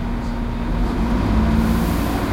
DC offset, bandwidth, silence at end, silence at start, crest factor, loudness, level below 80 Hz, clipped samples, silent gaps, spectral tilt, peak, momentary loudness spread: under 0.1%; 16 kHz; 0 s; 0 s; 12 dB; -20 LUFS; -22 dBFS; under 0.1%; none; -7 dB/octave; -6 dBFS; 7 LU